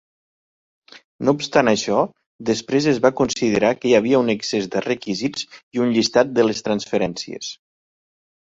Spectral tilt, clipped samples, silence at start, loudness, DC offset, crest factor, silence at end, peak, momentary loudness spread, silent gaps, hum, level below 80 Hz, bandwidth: -4.5 dB/octave; under 0.1%; 0.95 s; -20 LUFS; under 0.1%; 20 dB; 0.9 s; -2 dBFS; 10 LU; 1.04-1.19 s, 2.26-2.39 s, 5.63-5.72 s; none; -58 dBFS; 8 kHz